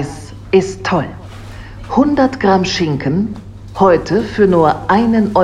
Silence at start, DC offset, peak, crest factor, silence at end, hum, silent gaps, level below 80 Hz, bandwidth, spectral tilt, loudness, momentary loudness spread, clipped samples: 0 s; under 0.1%; 0 dBFS; 14 dB; 0 s; none; none; -36 dBFS; 11 kHz; -6.5 dB/octave; -14 LUFS; 20 LU; under 0.1%